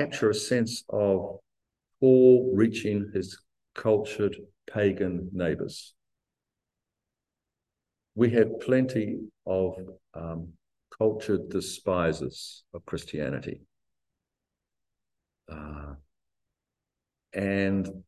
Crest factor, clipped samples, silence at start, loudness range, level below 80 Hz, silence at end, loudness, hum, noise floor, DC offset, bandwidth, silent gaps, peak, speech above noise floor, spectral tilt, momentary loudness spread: 20 dB; under 0.1%; 0 s; 16 LU; -54 dBFS; 0.05 s; -27 LUFS; none; -88 dBFS; under 0.1%; 12.5 kHz; none; -8 dBFS; 61 dB; -6.5 dB/octave; 20 LU